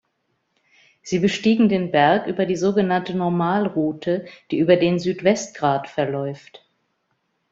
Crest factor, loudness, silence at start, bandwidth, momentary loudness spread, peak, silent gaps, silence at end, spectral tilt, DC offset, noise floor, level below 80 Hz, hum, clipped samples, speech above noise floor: 18 dB; -20 LUFS; 1.05 s; 7.8 kHz; 9 LU; -2 dBFS; none; 0.95 s; -6 dB/octave; under 0.1%; -71 dBFS; -60 dBFS; none; under 0.1%; 52 dB